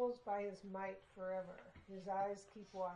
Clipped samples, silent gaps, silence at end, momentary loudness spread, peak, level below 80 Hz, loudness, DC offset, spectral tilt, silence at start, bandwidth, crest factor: under 0.1%; none; 0 s; 12 LU; -30 dBFS; -76 dBFS; -46 LUFS; under 0.1%; -6 dB/octave; 0 s; 10 kHz; 16 dB